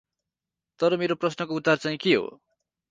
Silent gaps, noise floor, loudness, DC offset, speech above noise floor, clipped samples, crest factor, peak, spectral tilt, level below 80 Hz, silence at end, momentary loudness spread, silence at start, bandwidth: none; -88 dBFS; -25 LUFS; under 0.1%; 64 dB; under 0.1%; 20 dB; -8 dBFS; -5.5 dB/octave; -70 dBFS; 0.6 s; 4 LU; 0.8 s; 9.2 kHz